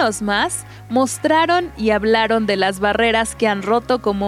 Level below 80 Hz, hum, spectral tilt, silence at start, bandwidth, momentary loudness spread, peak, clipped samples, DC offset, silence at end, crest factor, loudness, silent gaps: -42 dBFS; none; -3.5 dB/octave; 0 s; 15.5 kHz; 4 LU; -2 dBFS; under 0.1%; under 0.1%; 0 s; 16 dB; -17 LUFS; none